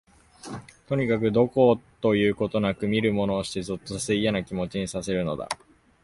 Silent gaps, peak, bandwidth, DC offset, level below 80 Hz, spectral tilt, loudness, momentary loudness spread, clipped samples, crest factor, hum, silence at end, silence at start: none; -6 dBFS; 11.5 kHz; under 0.1%; -52 dBFS; -5.5 dB/octave; -25 LUFS; 14 LU; under 0.1%; 18 dB; none; 0.5 s; 0.45 s